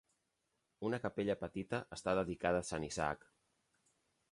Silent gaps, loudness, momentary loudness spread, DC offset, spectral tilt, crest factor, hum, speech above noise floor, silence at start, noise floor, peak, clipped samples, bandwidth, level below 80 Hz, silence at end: none; -39 LUFS; 6 LU; under 0.1%; -5 dB/octave; 22 dB; none; 46 dB; 0.8 s; -84 dBFS; -20 dBFS; under 0.1%; 11.5 kHz; -64 dBFS; 1.15 s